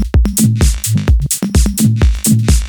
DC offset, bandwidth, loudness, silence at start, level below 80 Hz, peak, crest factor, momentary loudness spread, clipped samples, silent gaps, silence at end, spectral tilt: under 0.1%; over 20 kHz; -13 LUFS; 0 s; -14 dBFS; 0 dBFS; 10 dB; 2 LU; under 0.1%; none; 0 s; -5 dB/octave